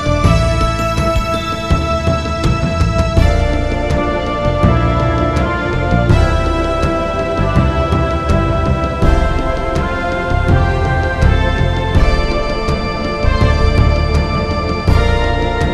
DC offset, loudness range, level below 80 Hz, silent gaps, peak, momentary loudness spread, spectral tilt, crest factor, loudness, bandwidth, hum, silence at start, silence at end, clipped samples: 0.7%; 1 LU; -18 dBFS; none; 0 dBFS; 4 LU; -6.5 dB/octave; 14 dB; -15 LUFS; 12 kHz; none; 0 s; 0 s; under 0.1%